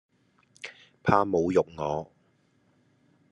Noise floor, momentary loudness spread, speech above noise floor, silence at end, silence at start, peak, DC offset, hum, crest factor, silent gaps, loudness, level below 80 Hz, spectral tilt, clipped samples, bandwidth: -67 dBFS; 20 LU; 42 dB; 1.25 s; 0.65 s; -6 dBFS; under 0.1%; none; 24 dB; none; -27 LUFS; -62 dBFS; -7 dB/octave; under 0.1%; 10.5 kHz